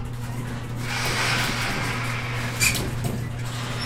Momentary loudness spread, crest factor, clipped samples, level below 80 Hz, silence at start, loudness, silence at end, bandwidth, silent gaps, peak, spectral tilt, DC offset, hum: 10 LU; 18 dB; under 0.1%; -40 dBFS; 0 s; -25 LUFS; 0 s; 16.5 kHz; none; -8 dBFS; -3.5 dB/octave; under 0.1%; none